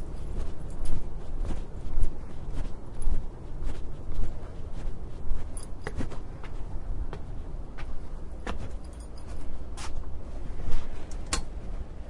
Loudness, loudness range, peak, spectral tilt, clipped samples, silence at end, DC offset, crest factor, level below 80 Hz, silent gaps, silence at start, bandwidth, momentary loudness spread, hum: -39 LUFS; 3 LU; -8 dBFS; -5 dB/octave; under 0.1%; 0 s; under 0.1%; 18 dB; -32 dBFS; none; 0 s; 11 kHz; 7 LU; none